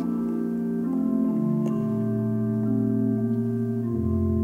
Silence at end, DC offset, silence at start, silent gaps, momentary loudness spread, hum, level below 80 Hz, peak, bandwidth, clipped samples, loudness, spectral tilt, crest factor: 0 s; under 0.1%; 0 s; none; 3 LU; none; -48 dBFS; -14 dBFS; 3 kHz; under 0.1%; -25 LUFS; -11 dB/octave; 10 dB